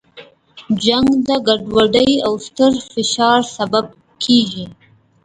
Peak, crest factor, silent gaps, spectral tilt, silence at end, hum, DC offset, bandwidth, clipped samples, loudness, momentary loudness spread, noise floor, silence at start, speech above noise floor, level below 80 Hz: 0 dBFS; 16 dB; none; -4 dB/octave; 0.5 s; none; under 0.1%; 9.4 kHz; under 0.1%; -15 LUFS; 9 LU; -42 dBFS; 0.15 s; 27 dB; -48 dBFS